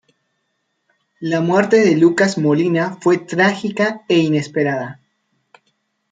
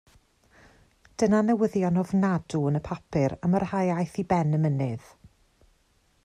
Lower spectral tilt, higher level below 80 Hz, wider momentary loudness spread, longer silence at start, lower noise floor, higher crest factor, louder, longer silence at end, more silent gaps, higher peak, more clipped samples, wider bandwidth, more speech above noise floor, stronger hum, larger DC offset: second, -6 dB/octave vs -8 dB/octave; second, -64 dBFS vs -56 dBFS; about the same, 8 LU vs 8 LU; about the same, 1.2 s vs 1.2 s; first, -70 dBFS vs -66 dBFS; about the same, 16 dB vs 16 dB; first, -16 LUFS vs -26 LUFS; about the same, 1.2 s vs 1.25 s; neither; first, -2 dBFS vs -10 dBFS; neither; second, 9.2 kHz vs 10.5 kHz; first, 55 dB vs 41 dB; neither; neither